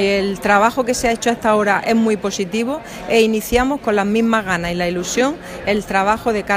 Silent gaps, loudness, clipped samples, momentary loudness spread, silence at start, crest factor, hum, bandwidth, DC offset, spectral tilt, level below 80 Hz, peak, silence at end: none; -17 LUFS; under 0.1%; 6 LU; 0 s; 16 dB; none; 15.5 kHz; under 0.1%; -4.5 dB/octave; -40 dBFS; 0 dBFS; 0 s